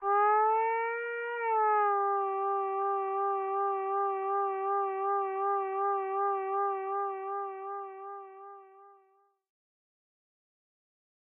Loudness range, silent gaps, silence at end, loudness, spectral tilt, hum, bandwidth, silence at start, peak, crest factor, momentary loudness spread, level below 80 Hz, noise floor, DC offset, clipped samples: 14 LU; none; 2.45 s; -31 LUFS; 0 dB/octave; none; 3.4 kHz; 0 s; -20 dBFS; 12 dB; 13 LU; -88 dBFS; -69 dBFS; under 0.1%; under 0.1%